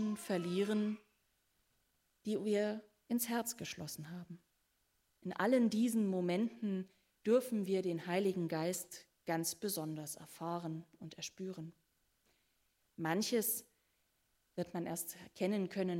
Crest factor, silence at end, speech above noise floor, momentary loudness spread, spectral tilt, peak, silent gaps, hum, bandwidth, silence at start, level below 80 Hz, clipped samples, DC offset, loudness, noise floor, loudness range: 18 dB; 0 s; 42 dB; 15 LU; -5 dB/octave; -20 dBFS; none; none; 16 kHz; 0 s; -82 dBFS; under 0.1%; under 0.1%; -38 LUFS; -80 dBFS; 7 LU